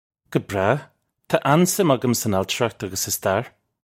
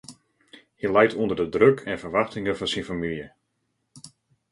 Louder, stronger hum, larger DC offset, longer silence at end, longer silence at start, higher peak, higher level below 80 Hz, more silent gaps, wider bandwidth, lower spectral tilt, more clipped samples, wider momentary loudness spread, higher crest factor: first, -21 LUFS vs -24 LUFS; neither; neither; about the same, 0.4 s vs 0.45 s; first, 0.3 s vs 0.1 s; about the same, -2 dBFS vs -4 dBFS; about the same, -60 dBFS vs -56 dBFS; neither; first, 16.5 kHz vs 11.5 kHz; about the same, -4.5 dB/octave vs -5.5 dB/octave; neither; second, 8 LU vs 12 LU; about the same, 20 dB vs 22 dB